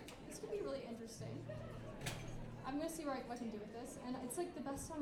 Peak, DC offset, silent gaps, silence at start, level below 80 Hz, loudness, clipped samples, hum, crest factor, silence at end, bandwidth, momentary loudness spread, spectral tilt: -26 dBFS; under 0.1%; none; 0 s; -60 dBFS; -47 LUFS; under 0.1%; none; 20 dB; 0 s; 19.5 kHz; 6 LU; -5 dB/octave